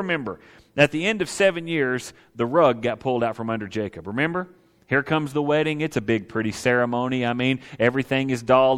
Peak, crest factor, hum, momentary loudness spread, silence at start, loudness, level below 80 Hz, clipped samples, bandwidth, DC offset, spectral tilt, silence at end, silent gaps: -2 dBFS; 20 dB; none; 10 LU; 0 s; -23 LUFS; -58 dBFS; under 0.1%; 15.5 kHz; under 0.1%; -5.5 dB/octave; 0 s; none